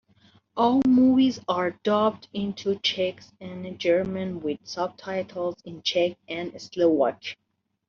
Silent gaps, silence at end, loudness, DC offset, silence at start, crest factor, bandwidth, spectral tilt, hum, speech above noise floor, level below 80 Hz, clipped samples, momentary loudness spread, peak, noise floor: none; 0.55 s; -25 LUFS; under 0.1%; 0.55 s; 16 dB; 7 kHz; -4 dB/octave; none; 35 dB; -64 dBFS; under 0.1%; 17 LU; -10 dBFS; -60 dBFS